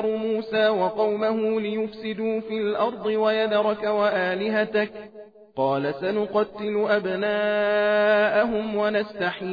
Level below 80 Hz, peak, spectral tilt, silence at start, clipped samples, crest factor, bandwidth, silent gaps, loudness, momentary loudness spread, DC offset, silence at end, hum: -62 dBFS; -10 dBFS; -7.5 dB/octave; 0 s; under 0.1%; 14 dB; 5 kHz; none; -24 LUFS; 7 LU; under 0.1%; 0 s; none